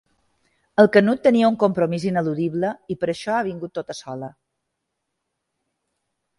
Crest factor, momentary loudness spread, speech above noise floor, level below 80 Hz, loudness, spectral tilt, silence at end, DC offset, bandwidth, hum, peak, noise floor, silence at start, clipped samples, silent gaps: 22 dB; 17 LU; 58 dB; -64 dBFS; -20 LUFS; -7 dB/octave; 2.1 s; under 0.1%; 11.5 kHz; none; 0 dBFS; -78 dBFS; 0.8 s; under 0.1%; none